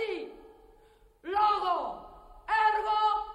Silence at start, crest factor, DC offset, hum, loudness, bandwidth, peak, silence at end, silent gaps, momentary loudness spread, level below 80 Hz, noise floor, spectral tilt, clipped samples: 0 s; 16 dB; under 0.1%; none; -28 LUFS; 9.8 kHz; -16 dBFS; 0 s; none; 19 LU; -58 dBFS; -60 dBFS; -3.5 dB/octave; under 0.1%